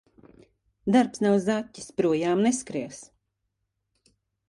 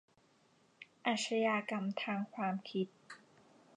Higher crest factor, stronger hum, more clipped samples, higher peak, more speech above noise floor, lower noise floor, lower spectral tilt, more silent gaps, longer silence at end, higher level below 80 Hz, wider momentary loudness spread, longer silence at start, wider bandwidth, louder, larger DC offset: about the same, 20 dB vs 20 dB; neither; neither; first, -8 dBFS vs -20 dBFS; first, 55 dB vs 33 dB; first, -79 dBFS vs -70 dBFS; about the same, -5.5 dB/octave vs -4.5 dB/octave; neither; first, 1.45 s vs 0.6 s; first, -66 dBFS vs under -90 dBFS; second, 12 LU vs 22 LU; about the same, 0.85 s vs 0.8 s; first, 11.5 kHz vs 10 kHz; first, -25 LUFS vs -37 LUFS; neither